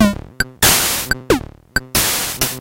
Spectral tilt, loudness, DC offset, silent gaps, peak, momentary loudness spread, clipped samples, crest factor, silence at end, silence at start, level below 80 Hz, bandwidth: -2.5 dB/octave; -16 LUFS; under 0.1%; none; 0 dBFS; 11 LU; under 0.1%; 18 dB; 0 s; 0 s; -34 dBFS; 17 kHz